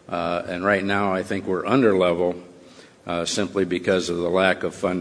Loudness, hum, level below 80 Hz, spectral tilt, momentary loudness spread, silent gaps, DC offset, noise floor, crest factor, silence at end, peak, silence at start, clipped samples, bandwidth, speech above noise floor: -22 LUFS; none; -58 dBFS; -5 dB/octave; 7 LU; none; under 0.1%; -48 dBFS; 20 dB; 0 s; -2 dBFS; 0.1 s; under 0.1%; 11 kHz; 26 dB